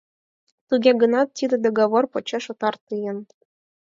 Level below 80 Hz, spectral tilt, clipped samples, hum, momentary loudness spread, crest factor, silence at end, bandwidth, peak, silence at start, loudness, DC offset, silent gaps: -74 dBFS; -5 dB/octave; under 0.1%; none; 12 LU; 18 dB; 0.65 s; 7.6 kHz; -4 dBFS; 0.7 s; -21 LUFS; under 0.1%; 2.81-2.87 s